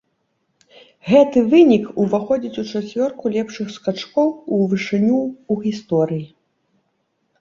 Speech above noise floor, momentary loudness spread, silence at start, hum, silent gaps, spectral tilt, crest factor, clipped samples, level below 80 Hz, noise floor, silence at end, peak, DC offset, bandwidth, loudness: 52 dB; 12 LU; 1.05 s; none; none; -7 dB/octave; 18 dB; under 0.1%; -60 dBFS; -69 dBFS; 1.15 s; -2 dBFS; under 0.1%; 7.4 kHz; -18 LUFS